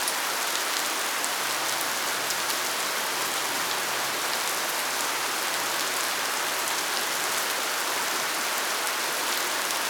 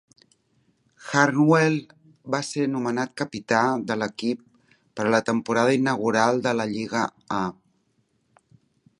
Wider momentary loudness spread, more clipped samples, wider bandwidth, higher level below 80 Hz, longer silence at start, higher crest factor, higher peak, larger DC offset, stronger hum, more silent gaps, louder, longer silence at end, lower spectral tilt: second, 1 LU vs 10 LU; neither; first, over 20 kHz vs 11.5 kHz; second, -78 dBFS vs -66 dBFS; second, 0 s vs 1 s; about the same, 22 dB vs 22 dB; second, -6 dBFS vs -2 dBFS; neither; neither; neither; second, -26 LUFS vs -23 LUFS; second, 0 s vs 1.45 s; second, 0.5 dB/octave vs -5.5 dB/octave